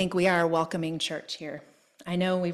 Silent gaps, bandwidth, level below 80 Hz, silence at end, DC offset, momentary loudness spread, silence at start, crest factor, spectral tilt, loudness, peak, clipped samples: none; 13 kHz; -64 dBFS; 0 s; under 0.1%; 16 LU; 0 s; 18 dB; -5 dB/octave; -28 LUFS; -10 dBFS; under 0.1%